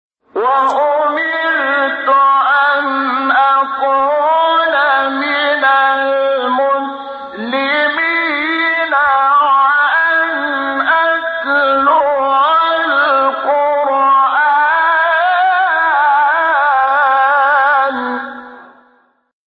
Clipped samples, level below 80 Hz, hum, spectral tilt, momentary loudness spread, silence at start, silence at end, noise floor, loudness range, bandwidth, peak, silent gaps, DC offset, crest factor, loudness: under 0.1%; -60 dBFS; none; -4 dB/octave; 5 LU; 0.35 s; 0.85 s; -54 dBFS; 3 LU; 7 kHz; -2 dBFS; none; under 0.1%; 10 dB; -12 LUFS